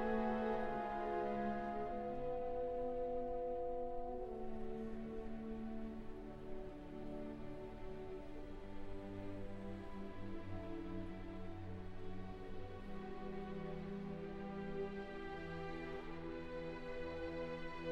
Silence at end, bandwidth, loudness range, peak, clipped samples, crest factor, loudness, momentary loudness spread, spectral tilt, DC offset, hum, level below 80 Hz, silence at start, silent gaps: 0 s; 6.8 kHz; 8 LU; -28 dBFS; under 0.1%; 16 dB; -46 LUFS; 10 LU; -8 dB/octave; under 0.1%; none; -54 dBFS; 0 s; none